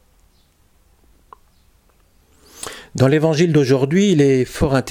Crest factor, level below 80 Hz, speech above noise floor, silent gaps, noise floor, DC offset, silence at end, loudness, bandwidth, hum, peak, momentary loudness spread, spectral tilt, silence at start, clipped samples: 16 dB; -42 dBFS; 41 dB; none; -56 dBFS; under 0.1%; 0 s; -15 LUFS; 16 kHz; none; -2 dBFS; 17 LU; -6.5 dB/octave; 2.6 s; under 0.1%